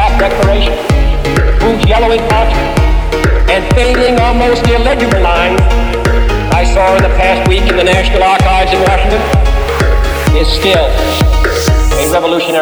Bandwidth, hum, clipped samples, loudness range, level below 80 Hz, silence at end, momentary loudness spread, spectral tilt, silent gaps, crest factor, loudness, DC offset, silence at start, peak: over 20 kHz; none; 0.1%; 1 LU; -12 dBFS; 0 s; 3 LU; -5.5 dB/octave; none; 8 dB; -10 LUFS; under 0.1%; 0 s; 0 dBFS